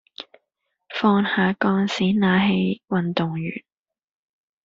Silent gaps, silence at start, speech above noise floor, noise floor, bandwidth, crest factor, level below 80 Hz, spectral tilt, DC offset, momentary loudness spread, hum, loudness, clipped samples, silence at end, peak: none; 0.9 s; 57 dB; -78 dBFS; 7.4 kHz; 18 dB; -60 dBFS; -5 dB/octave; under 0.1%; 18 LU; none; -21 LUFS; under 0.1%; 1.05 s; -4 dBFS